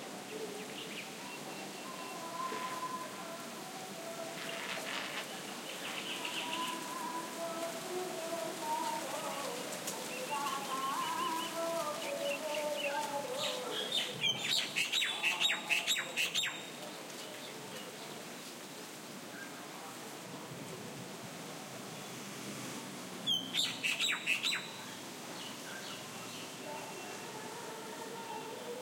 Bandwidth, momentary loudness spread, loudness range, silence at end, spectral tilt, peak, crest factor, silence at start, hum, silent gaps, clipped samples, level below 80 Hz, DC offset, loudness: 16.5 kHz; 13 LU; 12 LU; 0 s; -1.5 dB/octave; -18 dBFS; 22 dB; 0 s; none; none; under 0.1%; -90 dBFS; under 0.1%; -38 LUFS